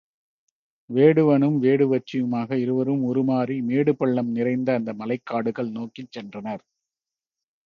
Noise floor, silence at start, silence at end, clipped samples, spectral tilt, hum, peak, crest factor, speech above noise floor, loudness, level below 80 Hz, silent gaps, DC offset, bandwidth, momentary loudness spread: under -90 dBFS; 0.9 s; 1.1 s; under 0.1%; -9.5 dB/octave; none; -4 dBFS; 20 dB; over 68 dB; -22 LUFS; -70 dBFS; none; under 0.1%; 6.6 kHz; 16 LU